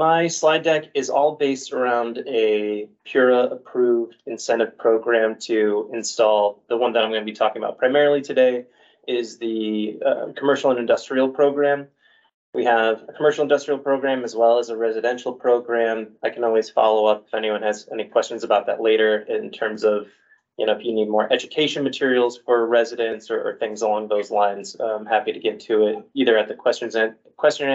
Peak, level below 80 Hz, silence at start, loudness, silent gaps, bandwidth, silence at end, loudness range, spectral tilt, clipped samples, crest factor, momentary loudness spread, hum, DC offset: -4 dBFS; -74 dBFS; 0 s; -21 LUFS; 12.34-12.53 s; 8 kHz; 0 s; 2 LU; -4 dB/octave; under 0.1%; 16 dB; 8 LU; none; under 0.1%